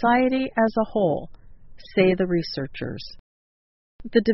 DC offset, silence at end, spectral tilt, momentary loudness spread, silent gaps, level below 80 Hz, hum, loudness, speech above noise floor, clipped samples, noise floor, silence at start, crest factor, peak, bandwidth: under 0.1%; 0 s; -5 dB/octave; 14 LU; 3.19-3.99 s; -48 dBFS; none; -23 LUFS; over 68 dB; under 0.1%; under -90 dBFS; 0 s; 18 dB; -4 dBFS; 6 kHz